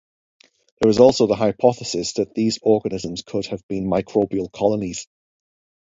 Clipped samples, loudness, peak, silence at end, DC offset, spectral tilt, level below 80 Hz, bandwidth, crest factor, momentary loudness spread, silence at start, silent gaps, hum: under 0.1%; -20 LUFS; 0 dBFS; 0.95 s; under 0.1%; -5.5 dB/octave; -52 dBFS; 7.8 kHz; 20 dB; 13 LU; 0.8 s; 3.63-3.69 s; none